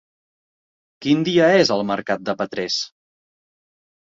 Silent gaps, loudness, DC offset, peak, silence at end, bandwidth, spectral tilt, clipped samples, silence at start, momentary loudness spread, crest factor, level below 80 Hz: none; -19 LUFS; under 0.1%; -2 dBFS; 1.3 s; 7.8 kHz; -5 dB/octave; under 0.1%; 1 s; 10 LU; 20 dB; -62 dBFS